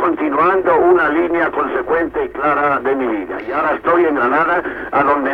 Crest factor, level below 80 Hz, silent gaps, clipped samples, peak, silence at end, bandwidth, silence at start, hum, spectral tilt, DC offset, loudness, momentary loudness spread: 14 dB; -46 dBFS; none; under 0.1%; -2 dBFS; 0 s; 4.9 kHz; 0 s; none; -7.5 dB/octave; under 0.1%; -15 LUFS; 7 LU